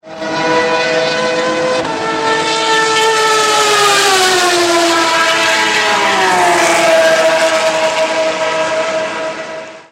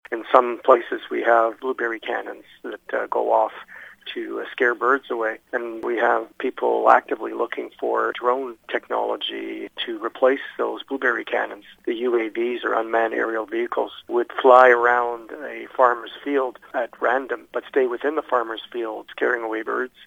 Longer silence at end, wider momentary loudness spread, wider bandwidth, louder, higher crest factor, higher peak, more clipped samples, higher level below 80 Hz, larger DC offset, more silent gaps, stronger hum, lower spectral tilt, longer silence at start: about the same, 0.1 s vs 0 s; second, 7 LU vs 12 LU; about the same, 16.5 kHz vs 15.5 kHz; first, -11 LUFS vs -22 LUFS; second, 12 dB vs 22 dB; about the same, 0 dBFS vs 0 dBFS; neither; first, -56 dBFS vs -70 dBFS; neither; neither; neither; second, -1.5 dB/octave vs -4 dB/octave; about the same, 0.05 s vs 0.1 s